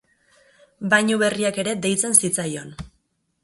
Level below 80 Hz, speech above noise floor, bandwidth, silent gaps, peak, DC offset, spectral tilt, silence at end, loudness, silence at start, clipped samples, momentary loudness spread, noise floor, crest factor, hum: -54 dBFS; 48 dB; 12 kHz; none; 0 dBFS; under 0.1%; -3 dB/octave; 0.55 s; -19 LUFS; 0.8 s; under 0.1%; 16 LU; -69 dBFS; 24 dB; none